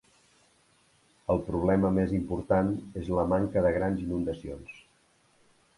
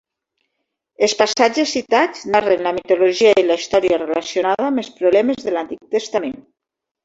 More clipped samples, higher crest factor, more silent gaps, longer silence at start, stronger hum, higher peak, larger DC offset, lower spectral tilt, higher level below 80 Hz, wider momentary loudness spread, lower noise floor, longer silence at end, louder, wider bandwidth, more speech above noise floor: neither; about the same, 18 dB vs 16 dB; neither; first, 1.3 s vs 1 s; neither; second, -12 dBFS vs -2 dBFS; neither; first, -9 dB/octave vs -3 dB/octave; first, -48 dBFS vs -58 dBFS; first, 14 LU vs 10 LU; second, -66 dBFS vs -83 dBFS; first, 1 s vs 0.65 s; second, -28 LUFS vs -17 LUFS; first, 11.5 kHz vs 8 kHz; second, 38 dB vs 67 dB